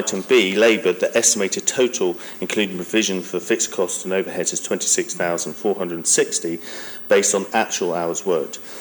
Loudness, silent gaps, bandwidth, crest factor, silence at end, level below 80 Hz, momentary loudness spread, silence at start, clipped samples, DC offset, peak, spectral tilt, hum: -19 LUFS; none; 19.5 kHz; 18 dB; 0 s; -72 dBFS; 8 LU; 0 s; under 0.1%; under 0.1%; -4 dBFS; -2 dB/octave; none